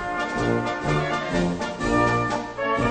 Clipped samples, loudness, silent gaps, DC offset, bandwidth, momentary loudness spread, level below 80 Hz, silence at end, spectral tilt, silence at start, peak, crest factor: under 0.1%; -24 LUFS; none; under 0.1%; 9.2 kHz; 6 LU; -40 dBFS; 0 s; -6 dB/octave; 0 s; -8 dBFS; 16 dB